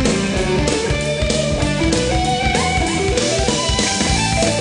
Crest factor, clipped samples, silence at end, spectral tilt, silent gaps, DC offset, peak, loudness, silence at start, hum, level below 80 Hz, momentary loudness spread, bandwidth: 16 dB; under 0.1%; 0 s; -4 dB/octave; none; under 0.1%; 0 dBFS; -17 LUFS; 0 s; none; -26 dBFS; 2 LU; 10.5 kHz